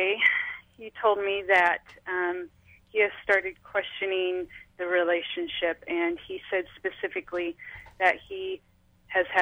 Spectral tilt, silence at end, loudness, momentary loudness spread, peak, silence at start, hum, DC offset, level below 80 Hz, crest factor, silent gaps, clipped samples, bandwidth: -4 dB/octave; 0 s; -27 LUFS; 14 LU; -10 dBFS; 0 s; none; under 0.1%; -64 dBFS; 18 dB; none; under 0.1%; 10 kHz